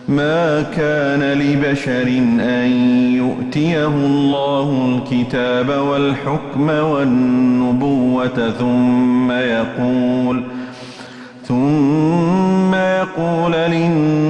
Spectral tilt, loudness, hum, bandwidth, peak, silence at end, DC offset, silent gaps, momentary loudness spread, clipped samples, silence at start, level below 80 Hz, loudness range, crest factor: -7.5 dB/octave; -16 LUFS; none; 8.6 kHz; -6 dBFS; 0 s; under 0.1%; none; 5 LU; under 0.1%; 0 s; -48 dBFS; 2 LU; 10 dB